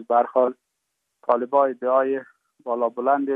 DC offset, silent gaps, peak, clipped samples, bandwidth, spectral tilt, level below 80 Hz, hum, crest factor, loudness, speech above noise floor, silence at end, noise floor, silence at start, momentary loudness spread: under 0.1%; none; -4 dBFS; under 0.1%; 3.8 kHz; -8 dB/octave; -86 dBFS; none; 18 dB; -22 LUFS; 56 dB; 0 s; -78 dBFS; 0 s; 10 LU